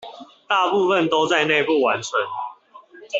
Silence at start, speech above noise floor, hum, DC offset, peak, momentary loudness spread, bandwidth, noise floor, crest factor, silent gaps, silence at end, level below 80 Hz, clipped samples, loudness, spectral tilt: 0 s; 27 dB; none; under 0.1%; -4 dBFS; 13 LU; 8 kHz; -46 dBFS; 18 dB; none; 0 s; -68 dBFS; under 0.1%; -19 LUFS; -3.5 dB/octave